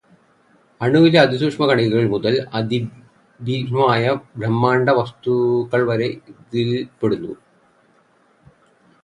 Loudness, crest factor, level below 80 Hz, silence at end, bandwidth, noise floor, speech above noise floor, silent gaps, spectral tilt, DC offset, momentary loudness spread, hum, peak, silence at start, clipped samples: -18 LUFS; 20 dB; -58 dBFS; 1.7 s; 10 kHz; -57 dBFS; 39 dB; none; -7.5 dB/octave; under 0.1%; 11 LU; none; 0 dBFS; 0.8 s; under 0.1%